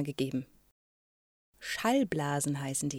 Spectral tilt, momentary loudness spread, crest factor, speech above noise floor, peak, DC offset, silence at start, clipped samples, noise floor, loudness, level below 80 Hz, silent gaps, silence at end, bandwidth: -4.5 dB/octave; 12 LU; 18 dB; over 58 dB; -16 dBFS; under 0.1%; 0 s; under 0.1%; under -90 dBFS; -32 LUFS; -66 dBFS; 0.71-1.53 s; 0 s; 16.5 kHz